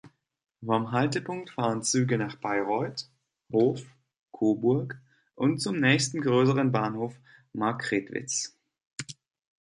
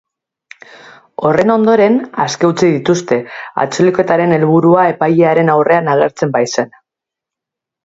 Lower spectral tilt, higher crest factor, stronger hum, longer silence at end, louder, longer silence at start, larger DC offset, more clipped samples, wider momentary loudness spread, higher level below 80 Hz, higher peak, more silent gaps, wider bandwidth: about the same, -5 dB/octave vs -6 dB/octave; first, 22 dB vs 12 dB; neither; second, 0.5 s vs 1.15 s; second, -27 LUFS vs -12 LUFS; second, 0.05 s vs 1.2 s; neither; neither; first, 17 LU vs 8 LU; second, -70 dBFS vs -54 dBFS; second, -6 dBFS vs 0 dBFS; first, 4.19-4.26 s, 8.87-8.97 s vs none; first, 11.5 kHz vs 8 kHz